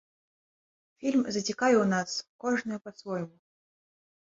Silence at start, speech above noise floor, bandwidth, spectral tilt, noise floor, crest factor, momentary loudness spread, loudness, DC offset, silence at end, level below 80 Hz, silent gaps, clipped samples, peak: 1 s; over 61 dB; 7.8 kHz; -4.5 dB/octave; under -90 dBFS; 18 dB; 13 LU; -29 LUFS; under 0.1%; 0.95 s; -72 dBFS; 2.29-2.39 s; under 0.1%; -12 dBFS